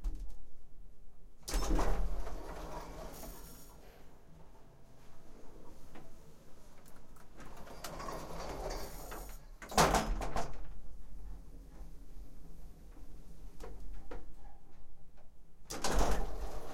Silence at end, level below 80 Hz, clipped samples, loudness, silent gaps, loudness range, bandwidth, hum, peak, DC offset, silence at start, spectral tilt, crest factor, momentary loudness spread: 0 s; -44 dBFS; under 0.1%; -39 LUFS; none; 20 LU; 16.5 kHz; none; -12 dBFS; under 0.1%; 0 s; -4 dB/octave; 24 dB; 25 LU